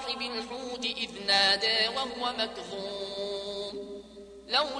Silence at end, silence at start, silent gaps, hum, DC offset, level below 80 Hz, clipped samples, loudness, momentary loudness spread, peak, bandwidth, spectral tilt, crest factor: 0 s; 0 s; none; none; under 0.1%; -62 dBFS; under 0.1%; -29 LUFS; 17 LU; -10 dBFS; 10.5 kHz; -1.5 dB/octave; 22 dB